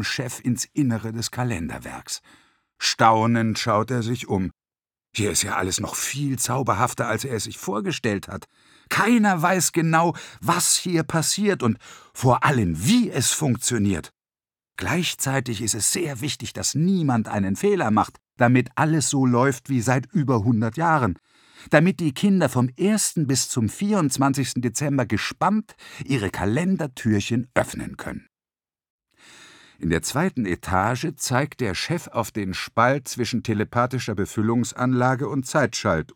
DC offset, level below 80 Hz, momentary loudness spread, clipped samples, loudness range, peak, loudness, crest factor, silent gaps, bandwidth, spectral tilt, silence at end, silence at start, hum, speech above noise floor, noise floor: under 0.1%; -54 dBFS; 9 LU; under 0.1%; 4 LU; -2 dBFS; -22 LUFS; 22 dB; 28.90-28.99 s; 20 kHz; -4.5 dB/octave; 0.1 s; 0 s; none; over 68 dB; under -90 dBFS